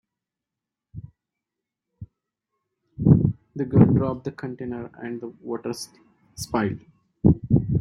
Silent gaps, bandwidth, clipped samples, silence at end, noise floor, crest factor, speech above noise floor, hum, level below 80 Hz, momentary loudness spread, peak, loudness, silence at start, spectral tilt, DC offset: none; 13 kHz; under 0.1%; 0 s; -87 dBFS; 22 dB; 63 dB; none; -44 dBFS; 20 LU; -2 dBFS; -23 LUFS; 0.95 s; -8 dB/octave; under 0.1%